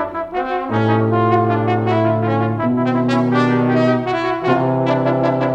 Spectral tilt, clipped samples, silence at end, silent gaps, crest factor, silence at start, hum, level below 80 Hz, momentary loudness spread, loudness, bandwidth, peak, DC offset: -8.5 dB/octave; under 0.1%; 0 s; none; 12 dB; 0 s; none; -50 dBFS; 4 LU; -17 LUFS; 8.4 kHz; -4 dBFS; under 0.1%